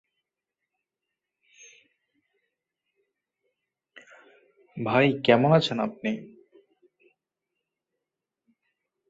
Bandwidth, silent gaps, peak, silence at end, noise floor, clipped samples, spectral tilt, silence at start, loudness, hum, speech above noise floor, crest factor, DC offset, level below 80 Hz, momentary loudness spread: 7.8 kHz; none; -4 dBFS; 2.85 s; -87 dBFS; under 0.1%; -6.5 dB/octave; 4.75 s; -24 LUFS; none; 64 dB; 26 dB; under 0.1%; -72 dBFS; 16 LU